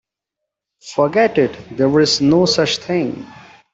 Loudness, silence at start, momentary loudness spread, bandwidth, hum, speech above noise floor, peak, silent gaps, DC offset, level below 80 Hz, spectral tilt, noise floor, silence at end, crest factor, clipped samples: -16 LUFS; 0.85 s; 10 LU; 8.2 kHz; none; 66 dB; -2 dBFS; none; under 0.1%; -54 dBFS; -4.5 dB/octave; -81 dBFS; 0.45 s; 14 dB; under 0.1%